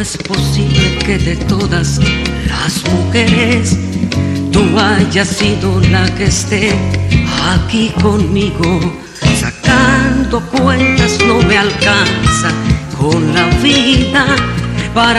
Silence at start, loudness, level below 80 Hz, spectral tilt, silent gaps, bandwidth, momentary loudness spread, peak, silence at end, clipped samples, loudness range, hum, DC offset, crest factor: 0 s; -12 LUFS; -24 dBFS; -5 dB/octave; none; 13.5 kHz; 6 LU; 0 dBFS; 0 s; under 0.1%; 2 LU; none; under 0.1%; 10 dB